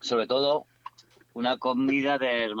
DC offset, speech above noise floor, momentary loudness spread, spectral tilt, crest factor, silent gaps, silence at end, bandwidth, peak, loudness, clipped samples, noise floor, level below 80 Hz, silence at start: under 0.1%; 23 dB; 22 LU; -4.5 dB/octave; 14 dB; none; 0 s; 7.8 kHz; -14 dBFS; -26 LUFS; under 0.1%; -48 dBFS; -72 dBFS; 0 s